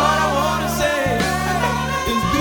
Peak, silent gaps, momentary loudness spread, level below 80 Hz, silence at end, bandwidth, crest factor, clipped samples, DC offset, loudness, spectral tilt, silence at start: -4 dBFS; none; 2 LU; -34 dBFS; 0 s; over 20 kHz; 16 dB; under 0.1%; under 0.1%; -19 LUFS; -4.5 dB/octave; 0 s